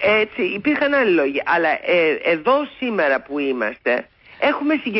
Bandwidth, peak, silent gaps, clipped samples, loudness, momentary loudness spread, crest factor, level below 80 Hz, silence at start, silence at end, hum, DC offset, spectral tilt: 5.8 kHz; -6 dBFS; none; under 0.1%; -19 LUFS; 5 LU; 12 dB; -58 dBFS; 0 s; 0 s; none; under 0.1%; -9.5 dB/octave